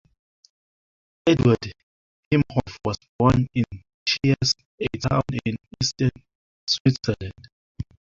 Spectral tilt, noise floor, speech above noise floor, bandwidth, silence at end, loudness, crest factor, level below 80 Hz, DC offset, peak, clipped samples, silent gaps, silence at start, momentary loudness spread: -5.5 dB/octave; under -90 dBFS; over 68 dB; 7.6 kHz; 0.35 s; -23 LUFS; 22 dB; -44 dBFS; under 0.1%; -4 dBFS; under 0.1%; 1.83-2.31 s, 3.09-3.19 s, 3.94-4.06 s, 4.65-4.78 s, 6.35-6.67 s, 6.80-6.85 s, 7.52-7.75 s; 1.25 s; 12 LU